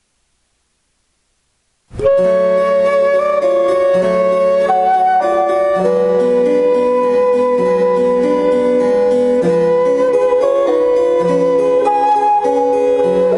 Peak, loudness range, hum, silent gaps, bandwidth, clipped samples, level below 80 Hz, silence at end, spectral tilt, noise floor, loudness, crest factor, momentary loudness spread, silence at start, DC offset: -2 dBFS; 2 LU; none; none; 11 kHz; under 0.1%; -48 dBFS; 0 s; -6.5 dB/octave; -63 dBFS; -13 LUFS; 10 dB; 1 LU; 1.95 s; under 0.1%